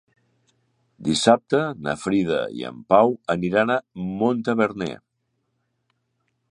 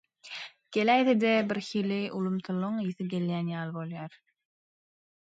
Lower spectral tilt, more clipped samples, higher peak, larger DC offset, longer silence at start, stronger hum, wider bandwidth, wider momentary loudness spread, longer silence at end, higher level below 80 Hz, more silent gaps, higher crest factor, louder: second, -5 dB/octave vs -6.5 dB/octave; neither; first, -2 dBFS vs -10 dBFS; neither; first, 1 s vs 0.25 s; neither; first, 11 kHz vs 8 kHz; second, 13 LU vs 17 LU; first, 1.55 s vs 1.1 s; first, -58 dBFS vs -78 dBFS; neither; about the same, 22 dB vs 20 dB; first, -22 LUFS vs -29 LUFS